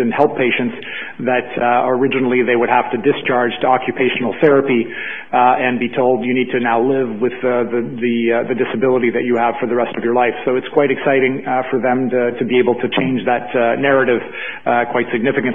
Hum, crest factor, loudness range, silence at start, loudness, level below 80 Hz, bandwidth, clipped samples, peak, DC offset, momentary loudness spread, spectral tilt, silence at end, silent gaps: none; 16 dB; 1 LU; 0 s; -16 LUFS; -60 dBFS; 3.7 kHz; under 0.1%; 0 dBFS; 1%; 5 LU; -9 dB/octave; 0 s; none